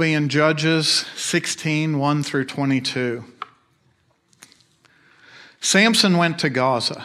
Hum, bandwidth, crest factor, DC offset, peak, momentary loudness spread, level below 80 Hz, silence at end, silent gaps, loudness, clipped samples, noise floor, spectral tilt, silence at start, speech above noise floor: none; 15 kHz; 20 dB; under 0.1%; -2 dBFS; 10 LU; -68 dBFS; 0 s; none; -19 LUFS; under 0.1%; -63 dBFS; -4 dB/octave; 0 s; 43 dB